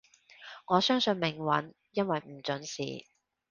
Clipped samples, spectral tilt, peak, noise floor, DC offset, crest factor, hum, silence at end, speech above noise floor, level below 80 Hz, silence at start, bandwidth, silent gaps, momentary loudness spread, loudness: under 0.1%; -4.5 dB/octave; -10 dBFS; -52 dBFS; under 0.1%; 22 dB; none; 0.5 s; 22 dB; -72 dBFS; 0.4 s; 9.6 kHz; none; 19 LU; -31 LUFS